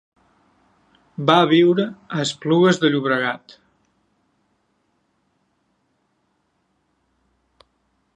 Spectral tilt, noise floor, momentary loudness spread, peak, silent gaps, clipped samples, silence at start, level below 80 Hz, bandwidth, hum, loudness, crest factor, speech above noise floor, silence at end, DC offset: -5.5 dB/octave; -68 dBFS; 11 LU; 0 dBFS; none; under 0.1%; 1.2 s; -70 dBFS; 9.4 kHz; none; -18 LUFS; 22 dB; 51 dB; 4.8 s; under 0.1%